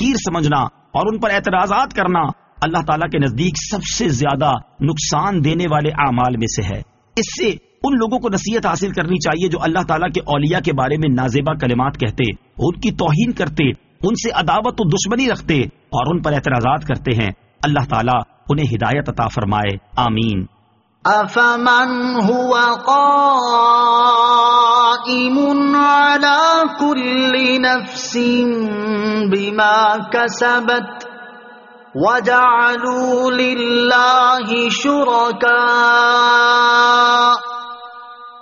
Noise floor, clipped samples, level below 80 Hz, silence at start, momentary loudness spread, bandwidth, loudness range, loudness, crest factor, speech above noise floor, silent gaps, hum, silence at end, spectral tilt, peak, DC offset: -56 dBFS; under 0.1%; -42 dBFS; 0 s; 10 LU; 7.4 kHz; 6 LU; -15 LUFS; 14 dB; 41 dB; none; none; 0 s; -3.5 dB/octave; -2 dBFS; under 0.1%